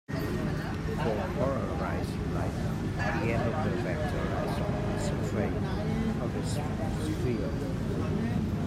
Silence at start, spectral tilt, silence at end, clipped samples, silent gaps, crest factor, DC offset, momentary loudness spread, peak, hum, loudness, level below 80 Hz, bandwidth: 0.1 s; -7 dB/octave; 0 s; under 0.1%; none; 14 dB; under 0.1%; 3 LU; -16 dBFS; none; -31 LUFS; -42 dBFS; 15.5 kHz